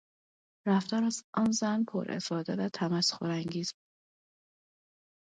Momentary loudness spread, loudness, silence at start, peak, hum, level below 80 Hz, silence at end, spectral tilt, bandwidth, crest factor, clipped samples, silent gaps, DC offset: 7 LU; -31 LUFS; 0.65 s; -16 dBFS; none; -74 dBFS; 1.5 s; -4.5 dB/octave; 9.4 kHz; 18 dB; under 0.1%; 1.24-1.33 s; under 0.1%